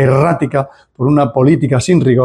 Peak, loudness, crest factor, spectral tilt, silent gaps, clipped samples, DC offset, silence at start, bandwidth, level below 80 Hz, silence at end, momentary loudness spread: 0 dBFS; -13 LUFS; 12 dB; -7.5 dB/octave; none; under 0.1%; under 0.1%; 0 s; 10.5 kHz; -44 dBFS; 0 s; 8 LU